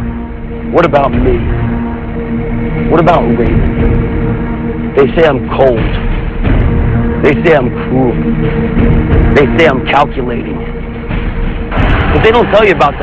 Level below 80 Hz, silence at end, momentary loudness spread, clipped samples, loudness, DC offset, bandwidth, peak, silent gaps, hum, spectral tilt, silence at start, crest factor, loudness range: -16 dBFS; 0 s; 10 LU; 0.6%; -11 LUFS; 0.6%; 8 kHz; 0 dBFS; none; none; -8.5 dB/octave; 0 s; 10 dB; 2 LU